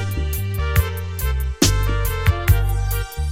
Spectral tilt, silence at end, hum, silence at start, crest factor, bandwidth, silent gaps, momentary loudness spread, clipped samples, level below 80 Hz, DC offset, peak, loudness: -4.5 dB/octave; 0 s; none; 0 s; 18 dB; 17 kHz; none; 7 LU; under 0.1%; -22 dBFS; under 0.1%; -2 dBFS; -21 LUFS